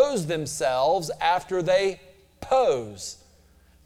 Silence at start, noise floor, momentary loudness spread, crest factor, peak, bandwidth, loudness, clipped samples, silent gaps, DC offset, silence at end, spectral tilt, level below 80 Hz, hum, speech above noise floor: 0 s; -57 dBFS; 15 LU; 18 dB; -8 dBFS; 15.5 kHz; -24 LUFS; under 0.1%; none; under 0.1%; 0.7 s; -4 dB/octave; -56 dBFS; none; 32 dB